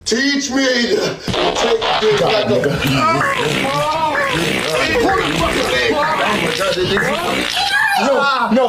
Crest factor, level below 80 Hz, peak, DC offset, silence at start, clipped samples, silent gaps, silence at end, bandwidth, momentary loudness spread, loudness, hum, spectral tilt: 10 dB; -40 dBFS; -6 dBFS; under 0.1%; 0.05 s; under 0.1%; none; 0 s; 16 kHz; 3 LU; -15 LUFS; none; -3.5 dB/octave